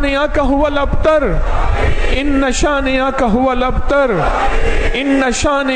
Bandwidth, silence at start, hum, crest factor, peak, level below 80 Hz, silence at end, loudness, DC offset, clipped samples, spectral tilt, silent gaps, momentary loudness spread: 9.4 kHz; 0 s; none; 10 dB; -4 dBFS; -18 dBFS; 0 s; -15 LUFS; under 0.1%; under 0.1%; -5 dB/octave; none; 4 LU